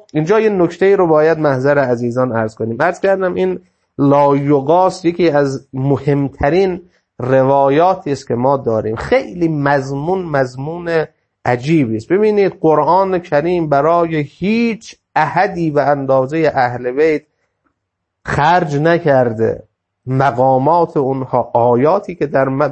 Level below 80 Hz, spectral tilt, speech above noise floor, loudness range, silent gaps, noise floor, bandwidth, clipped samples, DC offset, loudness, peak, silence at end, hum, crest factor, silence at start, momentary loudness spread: -46 dBFS; -7.5 dB/octave; 60 dB; 2 LU; none; -74 dBFS; 8.6 kHz; under 0.1%; under 0.1%; -14 LUFS; 0 dBFS; 0 s; none; 14 dB; 0.15 s; 7 LU